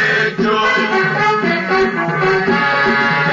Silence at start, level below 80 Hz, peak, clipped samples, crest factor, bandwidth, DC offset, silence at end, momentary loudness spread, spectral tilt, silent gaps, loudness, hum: 0 s; -48 dBFS; -6 dBFS; under 0.1%; 10 dB; 7.6 kHz; under 0.1%; 0 s; 2 LU; -5.5 dB/octave; none; -14 LUFS; none